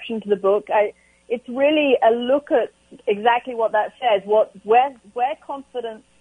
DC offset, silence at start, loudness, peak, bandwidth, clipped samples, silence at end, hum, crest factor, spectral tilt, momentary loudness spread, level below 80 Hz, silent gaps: under 0.1%; 0 s; -20 LUFS; -2 dBFS; 10 kHz; under 0.1%; 0.25 s; none; 18 dB; -6 dB/octave; 13 LU; -66 dBFS; none